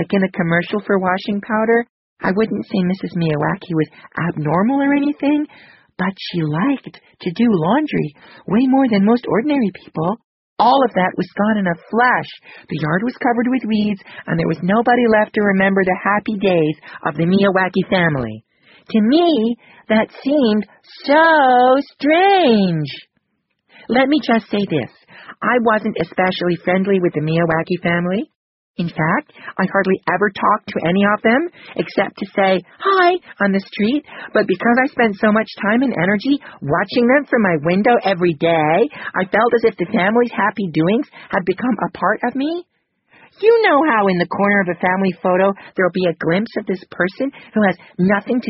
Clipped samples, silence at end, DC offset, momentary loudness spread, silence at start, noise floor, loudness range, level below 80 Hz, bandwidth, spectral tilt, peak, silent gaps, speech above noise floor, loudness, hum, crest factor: under 0.1%; 0 s; under 0.1%; 9 LU; 0 s; -71 dBFS; 4 LU; -54 dBFS; 5.8 kHz; -4.5 dB/octave; -2 dBFS; 1.89-2.17 s, 10.24-10.56 s, 28.36-28.74 s; 54 dB; -17 LUFS; none; 16 dB